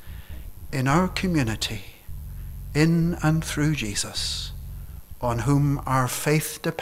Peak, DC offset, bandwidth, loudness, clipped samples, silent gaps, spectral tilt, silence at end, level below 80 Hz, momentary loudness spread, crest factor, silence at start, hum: -6 dBFS; under 0.1%; 16 kHz; -24 LUFS; under 0.1%; none; -5 dB/octave; 0 s; -38 dBFS; 19 LU; 18 dB; 0 s; none